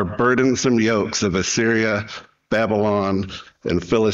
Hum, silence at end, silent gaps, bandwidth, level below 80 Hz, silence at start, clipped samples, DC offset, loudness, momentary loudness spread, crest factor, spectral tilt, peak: none; 0 s; none; 8 kHz; -48 dBFS; 0 s; under 0.1%; under 0.1%; -19 LUFS; 9 LU; 12 dB; -4.5 dB/octave; -6 dBFS